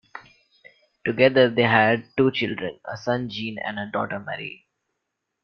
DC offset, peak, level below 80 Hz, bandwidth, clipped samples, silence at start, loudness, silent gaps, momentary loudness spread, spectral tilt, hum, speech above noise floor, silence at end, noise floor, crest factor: under 0.1%; -2 dBFS; -64 dBFS; 6.6 kHz; under 0.1%; 0.15 s; -23 LUFS; none; 15 LU; -7 dB/octave; none; 58 dB; 0.9 s; -80 dBFS; 22 dB